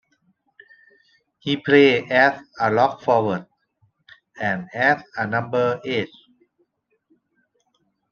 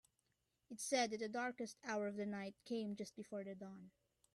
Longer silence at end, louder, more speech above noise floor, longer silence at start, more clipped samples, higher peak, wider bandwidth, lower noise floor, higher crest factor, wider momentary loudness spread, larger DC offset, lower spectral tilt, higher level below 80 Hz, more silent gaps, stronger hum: first, 2.05 s vs 0.45 s; first, -20 LUFS vs -45 LUFS; first, 50 dB vs 41 dB; first, 1.45 s vs 0.7 s; neither; first, -2 dBFS vs -26 dBFS; second, 6.8 kHz vs 13 kHz; second, -69 dBFS vs -86 dBFS; about the same, 20 dB vs 20 dB; second, 11 LU vs 14 LU; neither; first, -6.5 dB/octave vs -3.5 dB/octave; first, -66 dBFS vs -86 dBFS; neither; neither